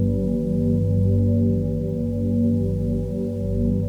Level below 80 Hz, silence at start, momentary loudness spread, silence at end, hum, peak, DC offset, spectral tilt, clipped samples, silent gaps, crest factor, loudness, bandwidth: -34 dBFS; 0 s; 5 LU; 0 s; 50 Hz at -35 dBFS; -10 dBFS; under 0.1%; -11.5 dB/octave; under 0.1%; none; 10 dB; -22 LUFS; 1.2 kHz